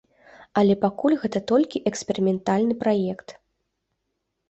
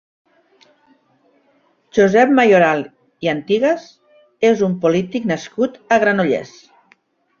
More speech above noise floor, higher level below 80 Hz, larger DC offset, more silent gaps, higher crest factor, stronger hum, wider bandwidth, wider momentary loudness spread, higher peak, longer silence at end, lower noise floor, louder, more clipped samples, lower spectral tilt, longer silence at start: first, 56 dB vs 44 dB; about the same, -62 dBFS vs -60 dBFS; neither; neither; about the same, 18 dB vs 16 dB; neither; first, 8.2 kHz vs 7.4 kHz; second, 7 LU vs 11 LU; second, -6 dBFS vs -2 dBFS; first, 1.15 s vs 0.95 s; first, -78 dBFS vs -59 dBFS; second, -23 LUFS vs -16 LUFS; neither; about the same, -6.5 dB/octave vs -6 dB/octave; second, 0.4 s vs 1.95 s